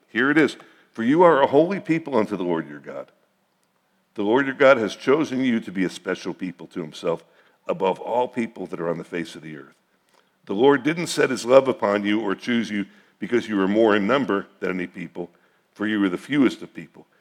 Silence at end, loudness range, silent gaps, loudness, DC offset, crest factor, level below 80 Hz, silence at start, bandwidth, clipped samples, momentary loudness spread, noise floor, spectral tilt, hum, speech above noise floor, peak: 0.35 s; 7 LU; none; -22 LUFS; under 0.1%; 22 dB; -78 dBFS; 0.15 s; 14.5 kHz; under 0.1%; 19 LU; -67 dBFS; -5.5 dB/octave; none; 46 dB; 0 dBFS